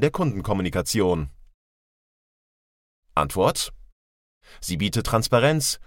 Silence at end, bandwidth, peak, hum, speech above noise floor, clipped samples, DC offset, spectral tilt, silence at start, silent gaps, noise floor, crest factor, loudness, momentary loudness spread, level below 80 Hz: 0.05 s; 17 kHz; -6 dBFS; none; over 67 dB; under 0.1%; under 0.1%; -4.5 dB/octave; 0 s; 1.54-3.03 s, 3.92-4.41 s; under -90 dBFS; 20 dB; -23 LUFS; 11 LU; -42 dBFS